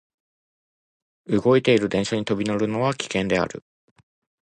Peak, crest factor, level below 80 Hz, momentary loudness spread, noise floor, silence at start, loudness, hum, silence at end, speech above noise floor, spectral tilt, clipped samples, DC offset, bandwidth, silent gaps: -6 dBFS; 18 dB; -56 dBFS; 7 LU; under -90 dBFS; 1.3 s; -22 LUFS; none; 0.95 s; over 69 dB; -5.5 dB/octave; under 0.1%; under 0.1%; 10 kHz; none